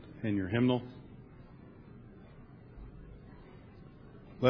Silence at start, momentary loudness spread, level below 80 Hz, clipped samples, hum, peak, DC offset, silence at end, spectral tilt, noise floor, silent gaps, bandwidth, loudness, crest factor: 0 s; 24 LU; -58 dBFS; under 0.1%; none; -12 dBFS; under 0.1%; 0 s; -6 dB/octave; -53 dBFS; none; 5.4 kHz; -32 LUFS; 24 dB